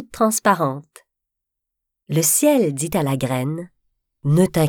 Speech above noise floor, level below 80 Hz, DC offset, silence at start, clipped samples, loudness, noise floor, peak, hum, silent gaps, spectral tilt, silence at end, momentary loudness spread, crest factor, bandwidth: 63 dB; -54 dBFS; under 0.1%; 0 s; under 0.1%; -19 LUFS; -81 dBFS; -2 dBFS; none; none; -5 dB/octave; 0 s; 12 LU; 18 dB; over 20 kHz